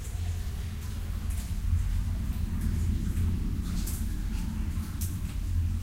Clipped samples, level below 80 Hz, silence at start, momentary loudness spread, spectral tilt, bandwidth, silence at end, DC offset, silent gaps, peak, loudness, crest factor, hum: under 0.1%; -32 dBFS; 0 s; 5 LU; -6 dB/octave; 16 kHz; 0 s; 0.2%; none; -16 dBFS; -33 LUFS; 12 dB; none